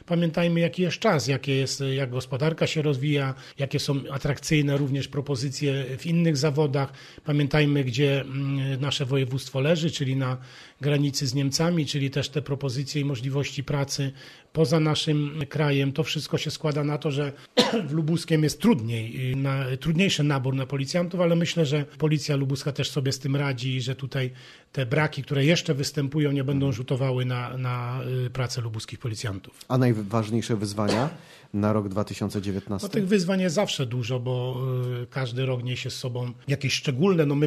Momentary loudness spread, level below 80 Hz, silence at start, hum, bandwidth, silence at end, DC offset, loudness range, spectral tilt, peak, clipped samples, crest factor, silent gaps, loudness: 8 LU; -56 dBFS; 0.1 s; none; 13.5 kHz; 0 s; under 0.1%; 3 LU; -5.5 dB/octave; -6 dBFS; under 0.1%; 20 dB; none; -26 LUFS